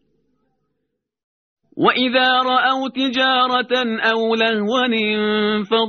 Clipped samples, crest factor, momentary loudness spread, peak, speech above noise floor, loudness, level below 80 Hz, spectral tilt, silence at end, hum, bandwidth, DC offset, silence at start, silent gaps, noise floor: under 0.1%; 18 dB; 4 LU; -2 dBFS; 58 dB; -17 LUFS; -64 dBFS; -1 dB/octave; 0 s; none; 6.6 kHz; under 0.1%; 1.75 s; none; -76 dBFS